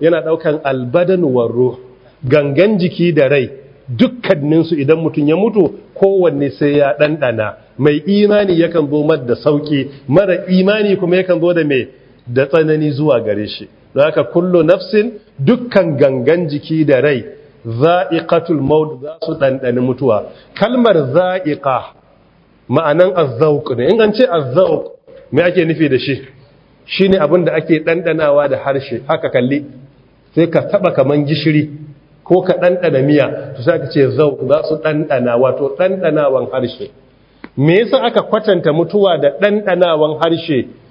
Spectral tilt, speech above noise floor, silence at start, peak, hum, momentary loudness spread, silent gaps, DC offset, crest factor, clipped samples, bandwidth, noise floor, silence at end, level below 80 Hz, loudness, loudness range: -9.5 dB/octave; 36 dB; 0 s; 0 dBFS; none; 7 LU; none; under 0.1%; 14 dB; under 0.1%; 5.4 kHz; -49 dBFS; 0.2 s; -52 dBFS; -13 LUFS; 2 LU